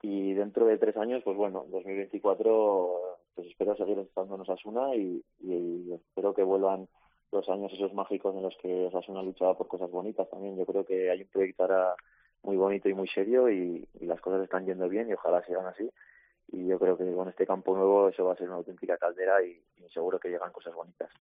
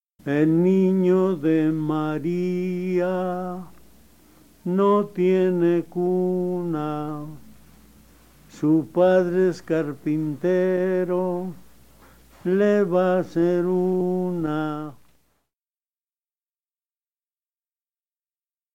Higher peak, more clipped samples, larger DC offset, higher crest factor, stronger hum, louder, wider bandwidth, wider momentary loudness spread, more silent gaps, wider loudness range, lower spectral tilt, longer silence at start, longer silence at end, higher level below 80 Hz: second, -12 dBFS vs -8 dBFS; neither; second, under 0.1% vs 0.3%; about the same, 18 dB vs 16 dB; neither; second, -30 LUFS vs -22 LUFS; second, 4.8 kHz vs 16 kHz; about the same, 13 LU vs 11 LU; neither; about the same, 4 LU vs 5 LU; second, -5.5 dB/octave vs -8.5 dB/octave; second, 0.05 s vs 0.25 s; second, 0.15 s vs 3.8 s; second, -74 dBFS vs -60 dBFS